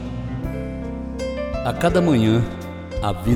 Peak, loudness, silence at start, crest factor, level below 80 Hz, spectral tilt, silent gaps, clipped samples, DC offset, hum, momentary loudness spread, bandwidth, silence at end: -4 dBFS; -22 LUFS; 0 s; 18 dB; -34 dBFS; -7 dB/octave; none; under 0.1%; under 0.1%; none; 13 LU; 16 kHz; 0 s